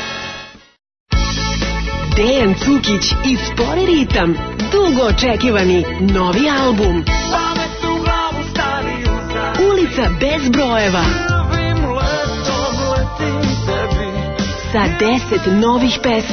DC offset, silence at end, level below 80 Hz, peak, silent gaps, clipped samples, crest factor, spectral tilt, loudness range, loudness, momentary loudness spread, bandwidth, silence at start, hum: under 0.1%; 0 s; -24 dBFS; -4 dBFS; 1.00-1.06 s; under 0.1%; 12 dB; -5 dB/octave; 3 LU; -16 LUFS; 6 LU; 6.6 kHz; 0 s; none